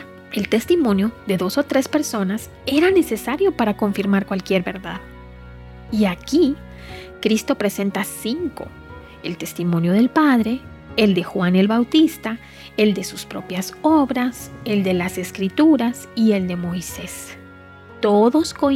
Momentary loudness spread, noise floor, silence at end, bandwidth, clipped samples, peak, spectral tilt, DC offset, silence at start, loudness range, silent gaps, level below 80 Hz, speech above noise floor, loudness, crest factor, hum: 15 LU; -42 dBFS; 0 s; 16.5 kHz; under 0.1%; -2 dBFS; -5.5 dB/octave; under 0.1%; 0 s; 4 LU; none; -48 dBFS; 23 dB; -19 LUFS; 18 dB; none